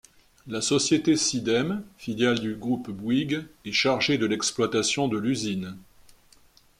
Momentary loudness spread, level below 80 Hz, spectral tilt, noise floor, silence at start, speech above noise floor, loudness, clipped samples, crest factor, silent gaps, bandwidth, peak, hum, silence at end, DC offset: 9 LU; -60 dBFS; -3.5 dB/octave; -57 dBFS; 0.45 s; 32 dB; -25 LUFS; under 0.1%; 18 dB; none; 15 kHz; -10 dBFS; none; 0.95 s; under 0.1%